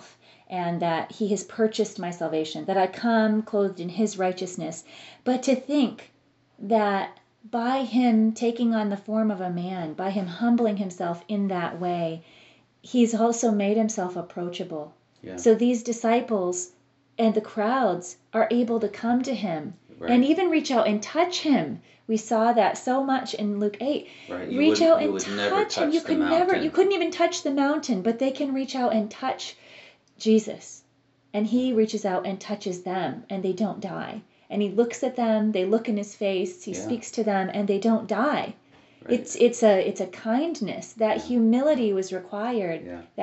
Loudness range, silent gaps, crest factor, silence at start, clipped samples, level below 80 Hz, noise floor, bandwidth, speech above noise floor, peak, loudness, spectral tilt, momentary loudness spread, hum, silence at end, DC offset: 4 LU; none; 18 dB; 0 s; under 0.1%; -72 dBFS; -64 dBFS; 8 kHz; 40 dB; -6 dBFS; -25 LUFS; -4.5 dB/octave; 11 LU; none; 0 s; under 0.1%